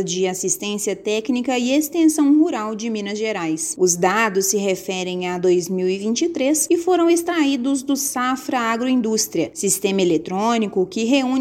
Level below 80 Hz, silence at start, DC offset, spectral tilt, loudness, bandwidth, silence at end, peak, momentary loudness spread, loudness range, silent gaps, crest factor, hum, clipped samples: -62 dBFS; 0 s; under 0.1%; -3.5 dB/octave; -19 LUFS; 17 kHz; 0 s; -4 dBFS; 7 LU; 1 LU; none; 16 dB; none; under 0.1%